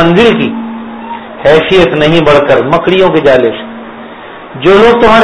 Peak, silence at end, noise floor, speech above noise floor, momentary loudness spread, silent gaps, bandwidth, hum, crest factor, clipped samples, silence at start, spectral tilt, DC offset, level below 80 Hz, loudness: 0 dBFS; 0 s; -27 dBFS; 21 dB; 21 LU; none; 11 kHz; none; 8 dB; 4%; 0 s; -6.5 dB/octave; under 0.1%; -34 dBFS; -7 LUFS